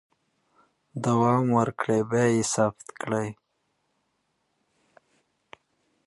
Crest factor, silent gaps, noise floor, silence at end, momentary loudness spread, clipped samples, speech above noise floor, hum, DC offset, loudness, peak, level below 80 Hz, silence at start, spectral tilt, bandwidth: 20 dB; none; -75 dBFS; 2.75 s; 11 LU; under 0.1%; 51 dB; none; under 0.1%; -25 LUFS; -8 dBFS; -64 dBFS; 0.95 s; -6 dB/octave; 11.5 kHz